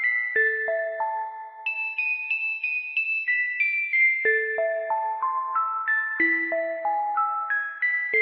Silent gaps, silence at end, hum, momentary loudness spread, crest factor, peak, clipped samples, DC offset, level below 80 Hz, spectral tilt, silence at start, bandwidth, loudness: none; 0 s; none; 6 LU; 14 dB; -12 dBFS; under 0.1%; under 0.1%; -88 dBFS; -5.5 dB/octave; 0 s; 5.6 kHz; -24 LUFS